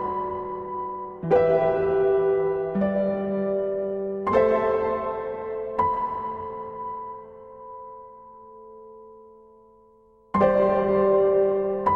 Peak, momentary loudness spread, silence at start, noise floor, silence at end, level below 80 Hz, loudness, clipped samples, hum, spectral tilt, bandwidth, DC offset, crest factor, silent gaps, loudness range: -8 dBFS; 21 LU; 0 s; -56 dBFS; 0 s; -54 dBFS; -24 LUFS; under 0.1%; none; -9.5 dB/octave; 5 kHz; under 0.1%; 18 dB; none; 15 LU